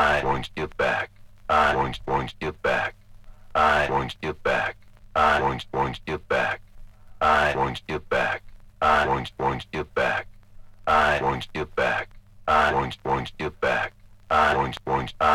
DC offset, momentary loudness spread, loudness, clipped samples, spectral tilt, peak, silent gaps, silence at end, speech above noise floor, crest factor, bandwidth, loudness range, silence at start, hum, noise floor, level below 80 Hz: under 0.1%; 11 LU; -24 LUFS; under 0.1%; -5 dB/octave; -8 dBFS; none; 0 s; 16 dB; 18 dB; 15.5 kHz; 2 LU; 0 s; none; -45 dBFS; -44 dBFS